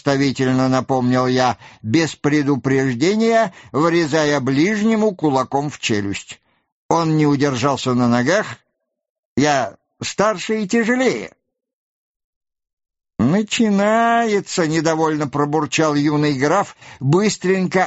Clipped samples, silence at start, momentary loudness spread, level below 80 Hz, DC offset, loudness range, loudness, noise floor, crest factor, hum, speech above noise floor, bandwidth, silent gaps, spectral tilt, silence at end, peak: under 0.1%; 0.05 s; 6 LU; -54 dBFS; under 0.1%; 4 LU; -18 LUFS; -74 dBFS; 16 dB; none; 57 dB; 8.2 kHz; 6.72-6.89 s, 9.10-9.36 s, 11.73-12.41 s, 12.73-12.77 s; -5.5 dB/octave; 0 s; -2 dBFS